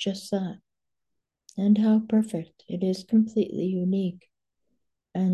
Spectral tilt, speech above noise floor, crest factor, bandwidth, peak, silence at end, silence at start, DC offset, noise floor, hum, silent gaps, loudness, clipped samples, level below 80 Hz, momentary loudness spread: -7.5 dB/octave; 63 dB; 16 dB; 11.5 kHz; -12 dBFS; 0 s; 0 s; under 0.1%; -88 dBFS; none; none; -26 LUFS; under 0.1%; -70 dBFS; 14 LU